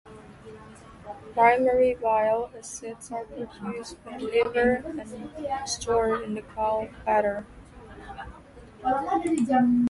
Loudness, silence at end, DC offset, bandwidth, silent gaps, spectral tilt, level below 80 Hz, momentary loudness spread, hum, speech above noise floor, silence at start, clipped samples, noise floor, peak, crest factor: -26 LUFS; 0 s; under 0.1%; 11.5 kHz; none; -4.5 dB/octave; -52 dBFS; 22 LU; none; 23 dB; 0.05 s; under 0.1%; -48 dBFS; -6 dBFS; 20 dB